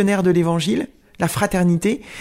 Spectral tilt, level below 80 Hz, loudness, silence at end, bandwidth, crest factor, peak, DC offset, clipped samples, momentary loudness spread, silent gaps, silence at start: -6 dB/octave; -44 dBFS; -19 LUFS; 0 s; 16 kHz; 16 dB; -2 dBFS; under 0.1%; under 0.1%; 8 LU; none; 0 s